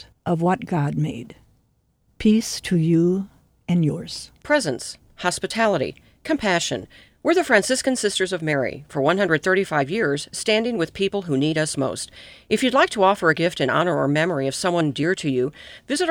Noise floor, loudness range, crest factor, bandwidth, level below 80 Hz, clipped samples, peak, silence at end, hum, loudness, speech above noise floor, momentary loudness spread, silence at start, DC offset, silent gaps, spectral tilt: -65 dBFS; 3 LU; 20 dB; 16.5 kHz; -54 dBFS; under 0.1%; -2 dBFS; 0 s; none; -21 LUFS; 44 dB; 10 LU; 0 s; under 0.1%; none; -5 dB/octave